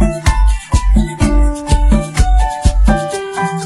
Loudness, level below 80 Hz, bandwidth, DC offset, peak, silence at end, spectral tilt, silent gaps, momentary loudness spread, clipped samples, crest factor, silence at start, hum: -15 LUFS; -12 dBFS; 12 kHz; under 0.1%; 0 dBFS; 0 s; -6 dB/octave; none; 3 LU; under 0.1%; 12 dB; 0 s; none